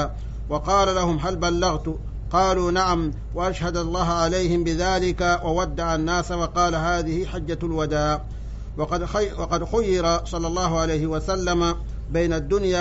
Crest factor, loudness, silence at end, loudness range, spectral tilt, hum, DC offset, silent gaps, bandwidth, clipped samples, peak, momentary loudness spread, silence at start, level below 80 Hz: 14 dB; -23 LUFS; 0 s; 2 LU; -5 dB/octave; none; under 0.1%; none; 8 kHz; under 0.1%; -8 dBFS; 8 LU; 0 s; -32 dBFS